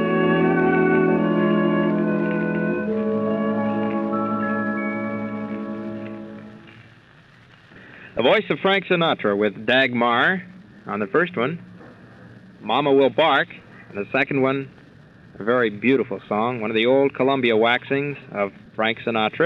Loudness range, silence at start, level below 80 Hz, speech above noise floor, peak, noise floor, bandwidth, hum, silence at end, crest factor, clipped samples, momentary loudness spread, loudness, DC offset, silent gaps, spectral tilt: 7 LU; 0 s; -60 dBFS; 30 dB; -6 dBFS; -50 dBFS; 5.8 kHz; none; 0 s; 16 dB; under 0.1%; 13 LU; -21 LUFS; under 0.1%; none; -8 dB/octave